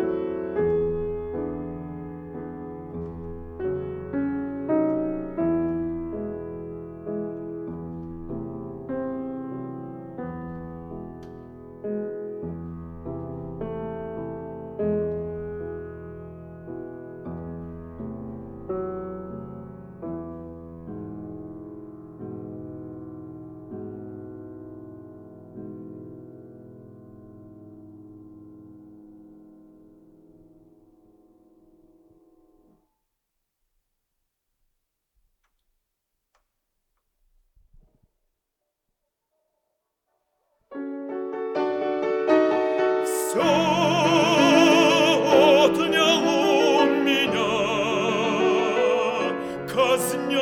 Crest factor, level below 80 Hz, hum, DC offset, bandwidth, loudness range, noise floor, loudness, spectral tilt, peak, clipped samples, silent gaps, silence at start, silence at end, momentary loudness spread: 22 dB; -54 dBFS; none; under 0.1%; 18.5 kHz; 22 LU; -81 dBFS; -24 LUFS; -4.5 dB/octave; -4 dBFS; under 0.1%; none; 0 s; 0 s; 22 LU